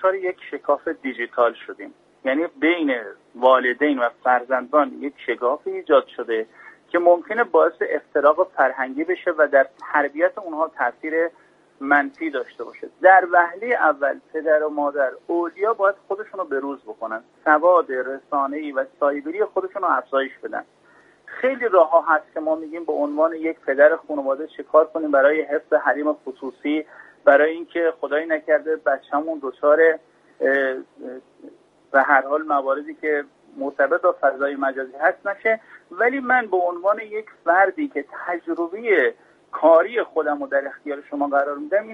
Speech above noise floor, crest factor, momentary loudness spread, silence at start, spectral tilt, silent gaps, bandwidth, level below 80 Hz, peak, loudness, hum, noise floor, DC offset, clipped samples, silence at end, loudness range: 33 dB; 20 dB; 13 LU; 0 s; -5.5 dB/octave; none; 4.8 kHz; -72 dBFS; -2 dBFS; -21 LUFS; none; -54 dBFS; under 0.1%; under 0.1%; 0 s; 3 LU